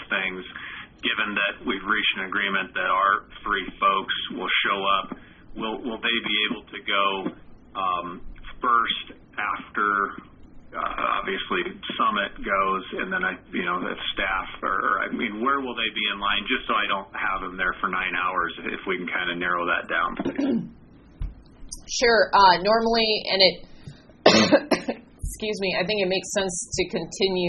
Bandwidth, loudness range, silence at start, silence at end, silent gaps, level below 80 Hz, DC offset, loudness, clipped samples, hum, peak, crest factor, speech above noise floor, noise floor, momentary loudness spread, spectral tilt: 7.2 kHz; 6 LU; 0 s; 0 s; none; -48 dBFS; under 0.1%; -24 LUFS; under 0.1%; none; 0 dBFS; 24 dB; 21 dB; -45 dBFS; 13 LU; -1 dB/octave